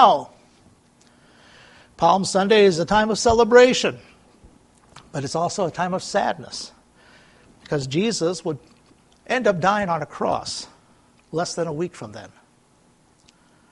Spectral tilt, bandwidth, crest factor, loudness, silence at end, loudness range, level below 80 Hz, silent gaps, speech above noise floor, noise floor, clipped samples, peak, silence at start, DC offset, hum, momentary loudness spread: -4.5 dB/octave; 11.5 kHz; 22 dB; -20 LUFS; 1.45 s; 10 LU; -52 dBFS; none; 38 dB; -58 dBFS; under 0.1%; 0 dBFS; 0 s; under 0.1%; none; 18 LU